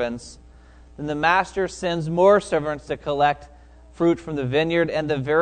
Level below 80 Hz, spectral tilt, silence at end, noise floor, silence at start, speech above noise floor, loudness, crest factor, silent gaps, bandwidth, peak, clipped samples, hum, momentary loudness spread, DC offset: -48 dBFS; -6 dB/octave; 0 s; -47 dBFS; 0 s; 26 dB; -22 LUFS; 20 dB; none; 9.4 kHz; -4 dBFS; under 0.1%; none; 12 LU; under 0.1%